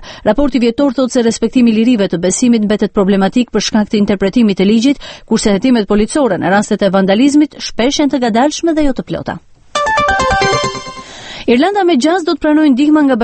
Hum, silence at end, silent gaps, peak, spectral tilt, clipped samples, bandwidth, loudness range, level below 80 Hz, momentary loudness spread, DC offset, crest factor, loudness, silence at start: none; 0 s; none; 0 dBFS; -5 dB/octave; under 0.1%; 8.8 kHz; 2 LU; -34 dBFS; 8 LU; under 0.1%; 12 dB; -12 LUFS; 0 s